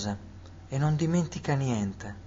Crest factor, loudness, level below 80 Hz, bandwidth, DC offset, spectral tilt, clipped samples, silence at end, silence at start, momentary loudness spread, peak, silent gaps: 14 dB; -29 LUFS; -52 dBFS; 7.8 kHz; under 0.1%; -6.5 dB/octave; under 0.1%; 0 s; 0 s; 15 LU; -16 dBFS; none